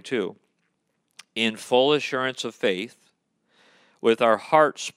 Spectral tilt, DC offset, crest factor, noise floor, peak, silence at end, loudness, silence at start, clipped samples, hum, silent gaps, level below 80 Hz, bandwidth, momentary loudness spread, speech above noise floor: -4 dB/octave; under 0.1%; 22 dB; -74 dBFS; -4 dBFS; 0.05 s; -23 LUFS; 0.05 s; under 0.1%; none; none; -82 dBFS; 15 kHz; 12 LU; 51 dB